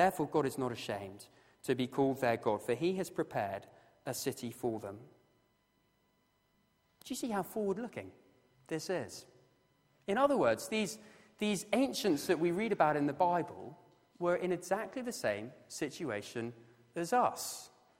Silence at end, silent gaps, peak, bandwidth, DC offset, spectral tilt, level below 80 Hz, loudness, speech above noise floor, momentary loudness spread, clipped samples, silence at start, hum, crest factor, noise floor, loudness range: 0.35 s; none; -14 dBFS; 16 kHz; under 0.1%; -5 dB/octave; -74 dBFS; -35 LUFS; 40 dB; 16 LU; under 0.1%; 0 s; none; 22 dB; -75 dBFS; 9 LU